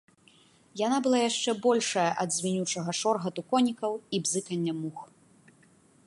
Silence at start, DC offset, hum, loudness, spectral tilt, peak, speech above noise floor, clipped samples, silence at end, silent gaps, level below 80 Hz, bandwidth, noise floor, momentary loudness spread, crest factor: 0.75 s; under 0.1%; none; -28 LUFS; -4 dB/octave; -12 dBFS; 33 dB; under 0.1%; 1 s; none; -78 dBFS; 11.5 kHz; -61 dBFS; 8 LU; 18 dB